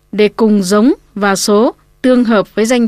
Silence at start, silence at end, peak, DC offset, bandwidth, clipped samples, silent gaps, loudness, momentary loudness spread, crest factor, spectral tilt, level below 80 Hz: 0.15 s; 0 s; 0 dBFS; under 0.1%; 15.5 kHz; under 0.1%; none; -12 LUFS; 5 LU; 10 dB; -5 dB/octave; -48 dBFS